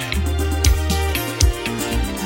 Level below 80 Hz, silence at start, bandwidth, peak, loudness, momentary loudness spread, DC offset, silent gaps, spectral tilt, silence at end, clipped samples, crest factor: -22 dBFS; 0 s; 16.5 kHz; 0 dBFS; -20 LUFS; 4 LU; under 0.1%; none; -4 dB/octave; 0 s; under 0.1%; 18 dB